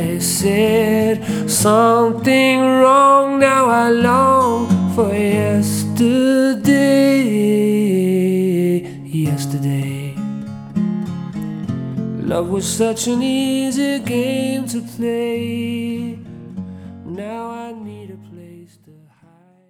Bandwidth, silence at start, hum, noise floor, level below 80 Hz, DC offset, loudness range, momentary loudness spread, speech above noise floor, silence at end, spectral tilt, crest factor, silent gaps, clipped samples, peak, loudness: 19.5 kHz; 0 s; none; -51 dBFS; -54 dBFS; under 0.1%; 12 LU; 16 LU; 36 dB; 1.05 s; -5.5 dB/octave; 16 dB; none; under 0.1%; 0 dBFS; -16 LUFS